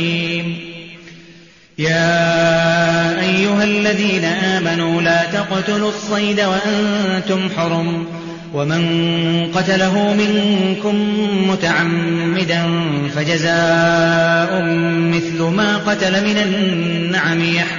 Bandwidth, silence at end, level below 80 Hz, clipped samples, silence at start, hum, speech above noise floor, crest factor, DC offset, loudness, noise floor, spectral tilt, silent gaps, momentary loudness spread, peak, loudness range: 7.4 kHz; 0 s; -52 dBFS; under 0.1%; 0 s; none; 28 dB; 14 dB; under 0.1%; -16 LUFS; -44 dBFS; -4 dB/octave; none; 6 LU; -2 dBFS; 3 LU